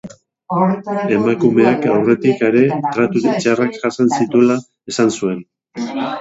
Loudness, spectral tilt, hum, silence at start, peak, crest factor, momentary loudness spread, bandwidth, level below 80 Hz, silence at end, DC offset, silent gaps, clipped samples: -16 LUFS; -6 dB/octave; none; 0.05 s; 0 dBFS; 16 dB; 9 LU; 8 kHz; -58 dBFS; 0 s; under 0.1%; none; under 0.1%